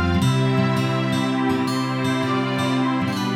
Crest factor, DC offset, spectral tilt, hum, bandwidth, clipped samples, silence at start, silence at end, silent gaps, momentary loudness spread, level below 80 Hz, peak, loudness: 12 dB; under 0.1%; -6 dB/octave; none; 15 kHz; under 0.1%; 0 s; 0 s; none; 3 LU; -44 dBFS; -8 dBFS; -21 LUFS